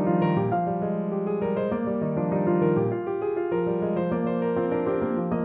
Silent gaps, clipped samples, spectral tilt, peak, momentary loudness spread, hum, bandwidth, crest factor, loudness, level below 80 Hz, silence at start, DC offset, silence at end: none; under 0.1%; -12.5 dB/octave; -12 dBFS; 5 LU; none; 4 kHz; 14 dB; -26 LUFS; -56 dBFS; 0 s; under 0.1%; 0 s